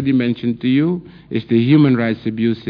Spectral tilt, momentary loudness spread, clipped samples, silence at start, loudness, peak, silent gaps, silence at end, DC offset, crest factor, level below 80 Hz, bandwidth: -10.5 dB/octave; 12 LU; under 0.1%; 0 s; -17 LUFS; -2 dBFS; none; 0 s; under 0.1%; 14 dB; -54 dBFS; 5.2 kHz